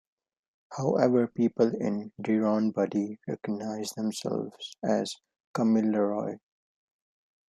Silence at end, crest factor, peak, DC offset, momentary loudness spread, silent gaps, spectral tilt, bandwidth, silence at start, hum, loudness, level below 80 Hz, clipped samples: 1.1 s; 20 dB; -8 dBFS; under 0.1%; 12 LU; 5.40-5.54 s; -6.5 dB/octave; 13 kHz; 0.7 s; none; -29 LUFS; -76 dBFS; under 0.1%